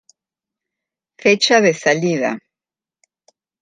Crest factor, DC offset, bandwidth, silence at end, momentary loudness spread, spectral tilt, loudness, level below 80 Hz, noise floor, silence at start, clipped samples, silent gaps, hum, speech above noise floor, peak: 18 dB; under 0.1%; 9.6 kHz; 1.25 s; 10 LU; -3.5 dB/octave; -15 LUFS; -68 dBFS; under -90 dBFS; 1.25 s; under 0.1%; none; none; over 75 dB; -2 dBFS